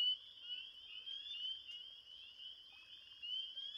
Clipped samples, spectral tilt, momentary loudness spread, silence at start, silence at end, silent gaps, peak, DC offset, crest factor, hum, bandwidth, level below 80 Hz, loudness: under 0.1%; 1 dB/octave; 12 LU; 0 s; 0 s; none; -30 dBFS; under 0.1%; 18 dB; none; 15.5 kHz; -86 dBFS; -46 LUFS